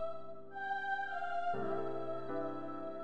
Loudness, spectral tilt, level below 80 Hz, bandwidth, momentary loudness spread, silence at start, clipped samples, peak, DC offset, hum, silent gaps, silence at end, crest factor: -40 LUFS; -7 dB/octave; -76 dBFS; 9 kHz; 7 LU; 0 s; under 0.1%; -24 dBFS; 0.7%; none; none; 0 s; 14 dB